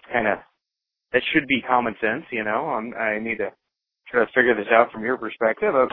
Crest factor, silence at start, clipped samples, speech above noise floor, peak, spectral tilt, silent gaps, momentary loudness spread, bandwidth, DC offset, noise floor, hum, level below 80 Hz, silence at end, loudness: 20 dB; 0.1 s; under 0.1%; 62 dB; -2 dBFS; -8.5 dB/octave; none; 8 LU; 4.2 kHz; under 0.1%; -84 dBFS; none; -60 dBFS; 0 s; -22 LUFS